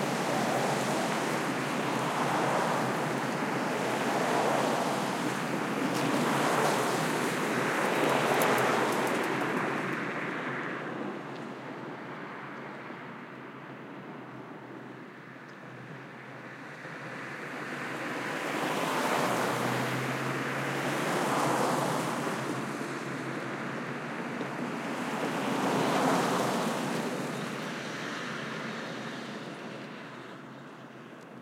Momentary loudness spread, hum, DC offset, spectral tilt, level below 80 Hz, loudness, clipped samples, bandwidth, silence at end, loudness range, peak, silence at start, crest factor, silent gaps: 17 LU; none; under 0.1%; -4.5 dB/octave; -78 dBFS; -31 LUFS; under 0.1%; 16.5 kHz; 0 s; 14 LU; -12 dBFS; 0 s; 20 dB; none